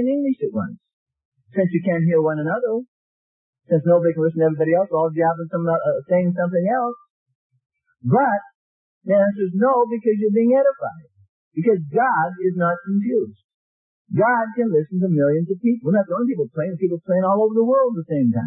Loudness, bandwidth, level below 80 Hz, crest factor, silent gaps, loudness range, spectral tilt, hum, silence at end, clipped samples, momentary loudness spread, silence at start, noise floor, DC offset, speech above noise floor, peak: -20 LUFS; 3.4 kHz; -70 dBFS; 14 dB; 0.93-1.06 s, 1.25-1.32 s, 2.88-3.53 s, 7.10-7.26 s, 7.35-7.50 s, 8.55-9.01 s, 11.29-11.51 s, 13.44-14.05 s; 3 LU; -14 dB/octave; none; 0 s; under 0.1%; 7 LU; 0 s; under -90 dBFS; under 0.1%; over 71 dB; -6 dBFS